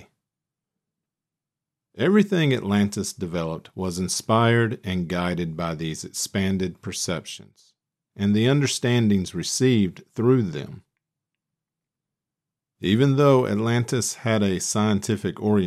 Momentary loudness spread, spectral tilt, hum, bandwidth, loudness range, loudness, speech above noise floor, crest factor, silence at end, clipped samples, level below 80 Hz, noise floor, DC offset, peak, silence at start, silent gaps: 10 LU; -5.5 dB/octave; none; 14.5 kHz; 4 LU; -23 LUFS; 66 dB; 18 dB; 0 s; under 0.1%; -58 dBFS; -88 dBFS; under 0.1%; -6 dBFS; 1.95 s; none